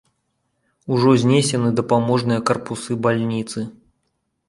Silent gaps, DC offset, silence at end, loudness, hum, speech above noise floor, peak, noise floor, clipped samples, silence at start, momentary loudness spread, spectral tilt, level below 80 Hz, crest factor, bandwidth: none; under 0.1%; 0.8 s; -19 LUFS; none; 54 dB; -2 dBFS; -72 dBFS; under 0.1%; 0.85 s; 13 LU; -6 dB/octave; -58 dBFS; 18 dB; 11.5 kHz